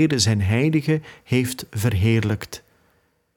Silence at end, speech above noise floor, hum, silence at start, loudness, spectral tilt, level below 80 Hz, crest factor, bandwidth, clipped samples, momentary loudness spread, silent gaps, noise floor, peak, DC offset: 0.8 s; 44 dB; none; 0 s; -21 LUFS; -5.5 dB/octave; -48 dBFS; 16 dB; 18 kHz; under 0.1%; 9 LU; none; -64 dBFS; -6 dBFS; under 0.1%